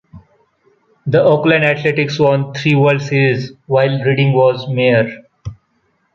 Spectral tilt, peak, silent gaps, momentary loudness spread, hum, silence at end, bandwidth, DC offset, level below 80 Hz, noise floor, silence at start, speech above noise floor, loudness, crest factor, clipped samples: -7.5 dB/octave; -2 dBFS; none; 12 LU; none; 0.6 s; 7.2 kHz; under 0.1%; -50 dBFS; -62 dBFS; 0.15 s; 49 dB; -14 LUFS; 14 dB; under 0.1%